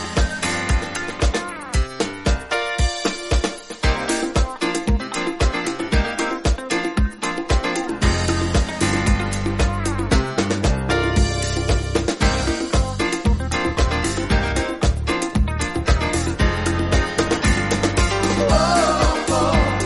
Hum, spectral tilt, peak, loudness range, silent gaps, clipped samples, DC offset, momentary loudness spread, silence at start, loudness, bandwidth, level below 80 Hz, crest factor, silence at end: none; -4.5 dB/octave; -4 dBFS; 3 LU; none; under 0.1%; under 0.1%; 4 LU; 0 s; -20 LUFS; 11.5 kHz; -24 dBFS; 16 dB; 0 s